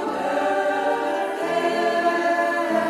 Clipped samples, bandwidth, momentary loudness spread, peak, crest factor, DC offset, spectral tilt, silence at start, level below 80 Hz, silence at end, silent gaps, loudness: under 0.1%; 15.5 kHz; 3 LU; -10 dBFS; 12 dB; under 0.1%; -4 dB/octave; 0 s; -68 dBFS; 0 s; none; -22 LUFS